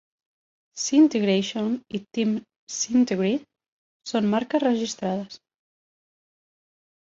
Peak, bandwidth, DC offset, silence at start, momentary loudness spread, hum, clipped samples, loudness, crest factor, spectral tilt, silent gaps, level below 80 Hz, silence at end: -8 dBFS; 7.8 kHz; under 0.1%; 0.75 s; 13 LU; none; under 0.1%; -24 LUFS; 18 dB; -4.5 dB/octave; 2.56-2.67 s, 3.68-4.00 s; -68 dBFS; 1.7 s